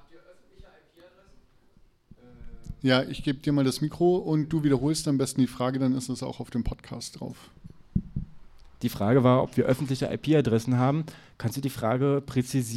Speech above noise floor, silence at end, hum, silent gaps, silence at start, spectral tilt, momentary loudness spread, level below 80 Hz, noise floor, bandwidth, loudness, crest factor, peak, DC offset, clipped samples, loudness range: 33 dB; 0 s; none; none; 0.15 s; -6.5 dB/octave; 14 LU; -48 dBFS; -59 dBFS; 15.5 kHz; -26 LUFS; 18 dB; -8 dBFS; under 0.1%; under 0.1%; 7 LU